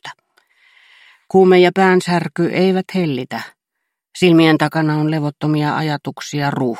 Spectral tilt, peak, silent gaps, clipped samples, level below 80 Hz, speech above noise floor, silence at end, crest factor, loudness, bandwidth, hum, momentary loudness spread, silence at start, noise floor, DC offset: -6.5 dB/octave; -2 dBFS; none; under 0.1%; -60 dBFS; 62 dB; 0 s; 16 dB; -15 LUFS; 14.5 kHz; none; 14 LU; 0.05 s; -77 dBFS; under 0.1%